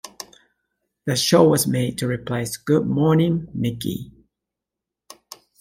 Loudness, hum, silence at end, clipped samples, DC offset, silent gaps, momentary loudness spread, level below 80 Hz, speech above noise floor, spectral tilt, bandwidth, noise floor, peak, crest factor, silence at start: -20 LUFS; none; 0.25 s; under 0.1%; under 0.1%; none; 22 LU; -54 dBFS; 66 dB; -5.5 dB/octave; 16.5 kHz; -86 dBFS; -2 dBFS; 20 dB; 0.05 s